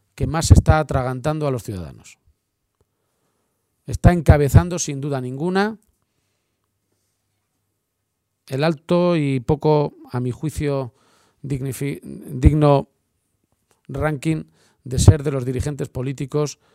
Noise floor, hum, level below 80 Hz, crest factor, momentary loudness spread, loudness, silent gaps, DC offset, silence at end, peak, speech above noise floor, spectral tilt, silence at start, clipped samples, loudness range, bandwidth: -75 dBFS; none; -30 dBFS; 20 dB; 16 LU; -20 LUFS; none; under 0.1%; 0.2 s; 0 dBFS; 57 dB; -6.5 dB/octave; 0.15 s; under 0.1%; 8 LU; 15.5 kHz